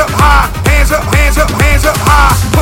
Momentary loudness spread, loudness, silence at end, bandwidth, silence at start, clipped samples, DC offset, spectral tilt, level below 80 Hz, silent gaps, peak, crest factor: 3 LU; -9 LUFS; 0 s; 17 kHz; 0 s; 0.3%; under 0.1%; -4.5 dB/octave; -12 dBFS; none; 0 dBFS; 8 dB